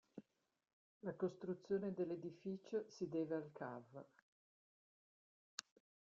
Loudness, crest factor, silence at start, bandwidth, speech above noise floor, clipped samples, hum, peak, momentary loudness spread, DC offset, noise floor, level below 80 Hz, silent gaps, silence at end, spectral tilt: -47 LUFS; 26 dB; 0.15 s; 7.6 kHz; over 44 dB; under 0.1%; none; -22 dBFS; 16 LU; under 0.1%; under -90 dBFS; -86 dBFS; 0.73-1.01 s, 4.22-5.58 s; 0.45 s; -6.5 dB/octave